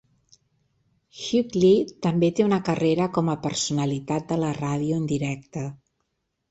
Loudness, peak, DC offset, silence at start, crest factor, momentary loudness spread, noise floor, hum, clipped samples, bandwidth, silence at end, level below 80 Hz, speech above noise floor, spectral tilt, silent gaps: -24 LUFS; -8 dBFS; under 0.1%; 1.15 s; 18 dB; 11 LU; -76 dBFS; none; under 0.1%; 8.2 kHz; 0.75 s; -58 dBFS; 53 dB; -6 dB/octave; none